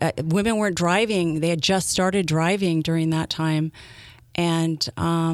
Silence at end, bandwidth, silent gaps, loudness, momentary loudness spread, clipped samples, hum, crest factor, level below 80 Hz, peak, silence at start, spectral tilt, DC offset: 0 s; 14.5 kHz; none; -22 LUFS; 4 LU; under 0.1%; none; 16 dB; -50 dBFS; -6 dBFS; 0 s; -5 dB/octave; under 0.1%